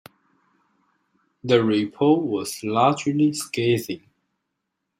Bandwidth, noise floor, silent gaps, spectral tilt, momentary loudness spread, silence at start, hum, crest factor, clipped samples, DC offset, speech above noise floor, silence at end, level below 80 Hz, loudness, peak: 16 kHz; -79 dBFS; none; -5.5 dB/octave; 9 LU; 1.45 s; none; 20 dB; under 0.1%; under 0.1%; 58 dB; 1 s; -66 dBFS; -21 LUFS; -4 dBFS